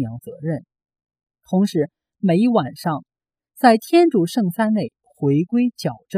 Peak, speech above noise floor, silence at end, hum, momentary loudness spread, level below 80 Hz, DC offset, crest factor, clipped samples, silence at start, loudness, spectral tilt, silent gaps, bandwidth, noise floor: 0 dBFS; 41 dB; 0 s; none; 13 LU; -66 dBFS; under 0.1%; 20 dB; under 0.1%; 0 s; -19 LUFS; -7 dB/octave; none; 15.5 kHz; -60 dBFS